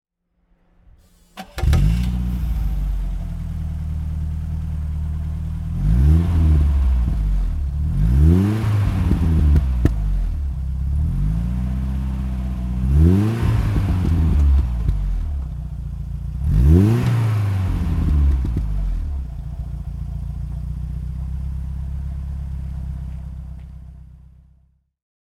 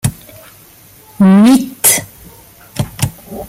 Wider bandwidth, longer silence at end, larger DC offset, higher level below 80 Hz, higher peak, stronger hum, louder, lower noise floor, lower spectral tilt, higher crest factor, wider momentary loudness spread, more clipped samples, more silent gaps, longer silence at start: second, 12 kHz vs 17 kHz; first, 1.15 s vs 0 s; neither; first, -22 dBFS vs -42 dBFS; about the same, 0 dBFS vs 0 dBFS; neither; second, -21 LUFS vs -11 LUFS; first, -64 dBFS vs -41 dBFS; first, -8.5 dB/octave vs -4.5 dB/octave; about the same, 18 dB vs 14 dB; about the same, 14 LU vs 15 LU; neither; neither; first, 1.35 s vs 0.05 s